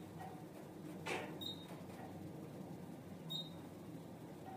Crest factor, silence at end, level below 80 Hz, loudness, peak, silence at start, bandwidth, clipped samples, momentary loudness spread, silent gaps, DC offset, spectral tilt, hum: 22 dB; 0 s; -78 dBFS; -49 LUFS; -28 dBFS; 0 s; 15.5 kHz; under 0.1%; 9 LU; none; under 0.1%; -5 dB/octave; none